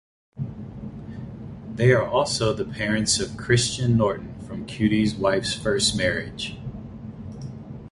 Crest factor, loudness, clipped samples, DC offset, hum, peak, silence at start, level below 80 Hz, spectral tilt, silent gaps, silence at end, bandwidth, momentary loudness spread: 20 dB; -23 LUFS; under 0.1%; under 0.1%; none; -4 dBFS; 0.35 s; -46 dBFS; -4.5 dB/octave; none; 0.05 s; 11.5 kHz; 17 LU